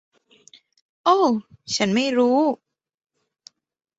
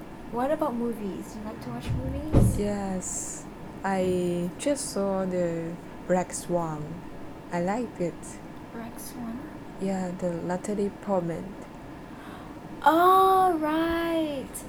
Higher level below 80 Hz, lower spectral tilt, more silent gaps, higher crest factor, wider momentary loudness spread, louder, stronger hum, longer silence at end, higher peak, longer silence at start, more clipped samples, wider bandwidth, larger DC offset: second, -66 dBFS vs -42 dBFS; second, -4.5 dB/octave vs -6 dB/octave; neither; about the same, 18 dB vs 22 dB; second, 9 LU vs 18 LU; first, -20 LUFS vs -27 LUFS; neither; first, 1.45 s vs 0 s; about the same, -4 dBFS vs -6 dBFS; first, 1.05 s vs 0 s; neither; second, 8.2 kHz vs over 20 kHz; neither